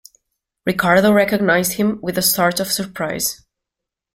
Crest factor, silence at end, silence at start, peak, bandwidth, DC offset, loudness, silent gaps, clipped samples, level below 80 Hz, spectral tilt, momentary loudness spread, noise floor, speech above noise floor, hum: 16 dB; 0.8 s; 0.65 s; -2 dBFS; 16.5 kHz; under 0.1%; -17 LUFS; none; under 0.1%; -52 dBFS; -3.5 dB/octave; 9 LU; -84 dBFS; 67 dB; none